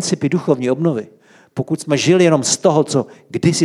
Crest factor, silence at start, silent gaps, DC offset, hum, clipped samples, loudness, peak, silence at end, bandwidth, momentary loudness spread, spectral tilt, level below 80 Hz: 14 dB; 0 s; none; under 0.1%; none; under 0.1%; -16 LUFS; -2 dBFS; 0 s; 13 kHz; 13 LU; -5 dB/octave; -60 dBFS